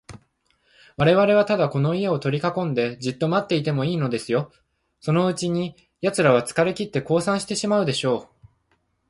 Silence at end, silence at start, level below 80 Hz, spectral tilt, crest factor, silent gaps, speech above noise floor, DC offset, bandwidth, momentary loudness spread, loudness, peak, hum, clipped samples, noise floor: 0.85 s; 0.1 s; -58 dBFS; -6 dB/octave; 18 dB; none; 47 dB; under 0.1%; 11.5 kHz; 9 LU; -22 LUFS; -4 dBFS; none; under 0.1%; -68 dBFS